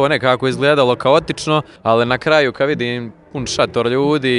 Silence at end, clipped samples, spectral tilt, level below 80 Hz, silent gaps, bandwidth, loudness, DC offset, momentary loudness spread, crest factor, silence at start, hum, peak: 0 s; under 0.1%; -5 dB/octave; -48 dBFS; none; 11.5 kHz; -16 LUFS; under 0.1%; 8 LU; 16 dB; 0 s; none; 0 dBFS